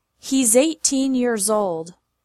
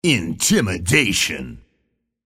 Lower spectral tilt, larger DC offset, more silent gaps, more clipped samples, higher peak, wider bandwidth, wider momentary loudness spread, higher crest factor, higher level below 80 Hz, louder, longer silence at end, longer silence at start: about the same, -2.5 dB/octave vs -3.5 dB/octave; neither; neither; neither; second, -4 dBFS vs 0 dBFS; about the same, 15 kHz vs 16 kHz; about the same, 11 LU vs 11 LU; about the same, 18 dB vs 20 dB; second, -62 dBFS vs -44 dBFS; about the same, -19 LUFS vs -17 LUFS; second, 0.35 s vs 0.7 s; first, 0.25 s vs 0.05 s